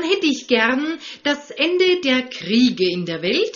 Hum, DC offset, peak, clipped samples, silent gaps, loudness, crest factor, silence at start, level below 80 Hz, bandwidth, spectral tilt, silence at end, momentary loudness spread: none; under 0.1%; -2 dBFS; under 0.1%; none; -19 LUFS; 16 dB; 0 s; -62 dBFS; 7.2 kHz; -2 dB/octave; 0.05 s; 7 LU